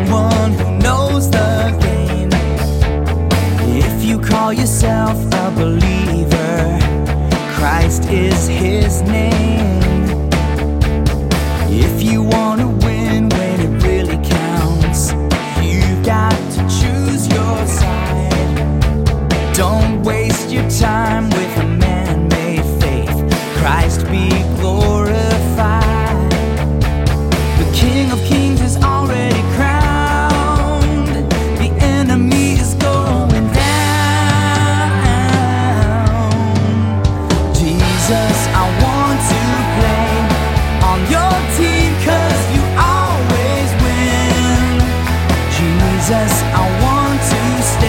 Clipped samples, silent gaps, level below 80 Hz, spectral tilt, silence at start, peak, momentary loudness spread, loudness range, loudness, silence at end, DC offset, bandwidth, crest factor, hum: under 0.1%; none; -20 dBFS; -5.5 dB/octave; 0 s; 0 dBFS; 3 LU; 2 LU; -14 LUFS; 0 s; under 0.1%; 17 kHz; 12 dB; none